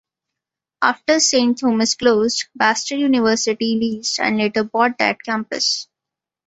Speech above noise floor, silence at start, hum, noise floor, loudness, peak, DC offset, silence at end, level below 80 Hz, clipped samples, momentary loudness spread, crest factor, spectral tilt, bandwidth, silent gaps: 68 dB; 0.8 s; none; -86 dBFS; -18 LUFS; -2 dBFS; under 0.1%; 0.65 s; -62 dBFS; under 0.1%; 5 LU; 18 dB; -2.5 dB/octave; 8.2 kHz; none